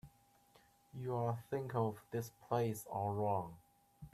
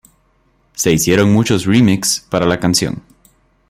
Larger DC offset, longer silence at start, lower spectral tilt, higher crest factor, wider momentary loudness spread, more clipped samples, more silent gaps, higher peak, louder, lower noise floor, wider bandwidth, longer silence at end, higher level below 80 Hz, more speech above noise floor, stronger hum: neither; second, 0.05 s vs 0.8 s; first, -7 dB/octave vs -4.5 dB/octave; about the same, 18 dB vs 16 dB; about the same, 10 LU vs 9 LU; neither; neither; second, -22 dBFS vs 0 dBFS; second, -40 LUFS vs -14 LUFS; first, -69 dBFS vs -57 dBFS; second, 14.5 kHz vs 16 kHz; second, 0.05 s vs 0.7 s; second, -72 dBFS vs -44 dBFS; second, 30 dB vs 44 dB; neither